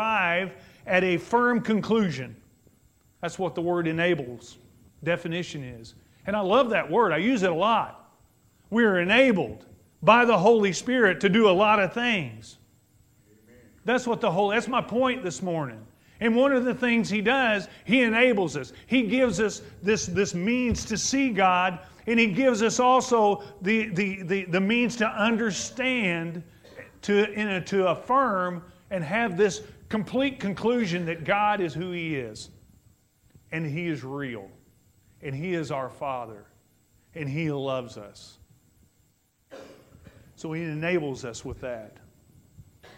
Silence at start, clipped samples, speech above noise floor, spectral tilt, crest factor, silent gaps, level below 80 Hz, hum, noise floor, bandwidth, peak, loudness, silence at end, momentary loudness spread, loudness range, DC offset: 0 s; under 0.1%; 42 dB; -5 dB/octave; 22 dB; none; -56 dBFS; none; -67 dBFS; 15.5 kHz; -4 dBFS; -25 LUFS; 0.1 s; 16 LU; 13 LU; under 0.1%